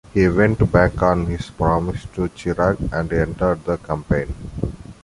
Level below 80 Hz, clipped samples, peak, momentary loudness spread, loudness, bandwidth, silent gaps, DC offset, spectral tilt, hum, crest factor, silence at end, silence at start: -32 dBFS; under 0.1%; -2 dBFS; 11 LU; -20 LUFS; 11.5 kHz; none; under 0.1%; -8 dB/octave; none; 18 dB; 0.1 s; 0.15 s